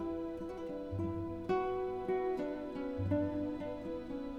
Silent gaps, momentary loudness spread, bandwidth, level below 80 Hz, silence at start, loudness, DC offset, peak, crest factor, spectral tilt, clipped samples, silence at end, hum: none; 7 LU; 8.2 kHz; -58 dBFS; 0 s; -38 LUFS; under 0.1%; -22 dBFS; 16 dB; -9 dB/octave; under 0.1%; 0 s; none